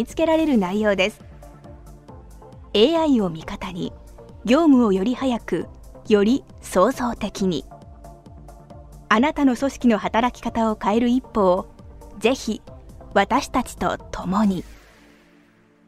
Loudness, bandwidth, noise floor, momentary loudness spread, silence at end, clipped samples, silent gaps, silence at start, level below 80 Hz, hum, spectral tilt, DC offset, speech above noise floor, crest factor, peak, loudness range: -21 LUFS; 15 kHz; -55 dBFS; 12 LU; 1.15 s; under 0.1%; none; 0 s; -44 dBFS; none; -5.5 dB/octave; under 0.1%; 35 dB; 20 dB; -2 dBFS; 4 LU